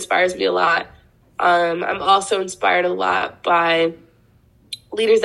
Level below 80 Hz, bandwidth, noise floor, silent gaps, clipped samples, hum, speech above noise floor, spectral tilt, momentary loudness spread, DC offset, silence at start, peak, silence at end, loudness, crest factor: -58 dBFS; 12.5 kHz; -54 dBFS; none; under 0.1%; none; 37 dB; -3 dB/octave; 12 LU; under 0.1%; 0 s; -2 dBFS; 0 s; -18 LUFS; 16 dB